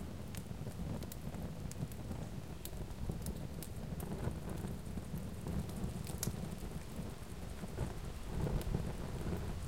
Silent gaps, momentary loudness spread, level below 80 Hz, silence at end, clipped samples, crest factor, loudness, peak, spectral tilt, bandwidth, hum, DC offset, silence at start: none; 6 LU; -48 dBFS; 0 s; under 0.1%; 22 dB; -44 LUFS; -20 dBFS; -6 dB/octave; 17 kHz; none; 0.3%; 0 s